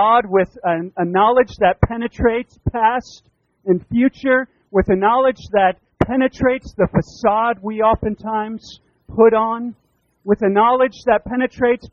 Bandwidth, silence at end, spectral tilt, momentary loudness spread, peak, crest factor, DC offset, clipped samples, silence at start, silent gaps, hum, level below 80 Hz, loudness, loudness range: 7.2 kHz; 0.05 s; -5.5 dB/octave; 9 LU; 0 dBFS; 18 dB; under 0.1%; under 0.1%; 0 s; none; none; -38 dBFS; -17 LUFS; 2 LU